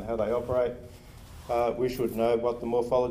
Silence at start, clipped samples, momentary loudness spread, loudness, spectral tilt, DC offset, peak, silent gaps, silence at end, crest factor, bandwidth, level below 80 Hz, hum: 0 s; under 0.1%; 19 LU; -28 LUFS; -7 dB/octave; under 0.1%; -14 dBFS; none; 0 s; 14 dB; 15.5 kHz; -50 dBFS; none